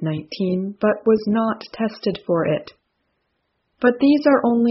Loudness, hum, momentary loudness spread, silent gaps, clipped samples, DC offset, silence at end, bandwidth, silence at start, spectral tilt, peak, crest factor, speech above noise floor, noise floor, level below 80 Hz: -20 LUFS; none; 10 LU; none; under 0.1%; under 0.1%; 0 s; 6 kHz; 0 s; -6 dB/octave; -2 dBFS; 18 dB; 53 dB; -72 dBFS; -60 dBFS